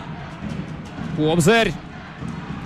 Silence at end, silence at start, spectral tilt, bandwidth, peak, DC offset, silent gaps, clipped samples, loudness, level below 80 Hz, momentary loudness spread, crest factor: 0 s; 0 s; -5 dB/octave; 15 kHz; -6 dBFS; under 0.1%; none; under 0.1%; -21 LUFS; -44 dBFS; 18 LU; 16 dB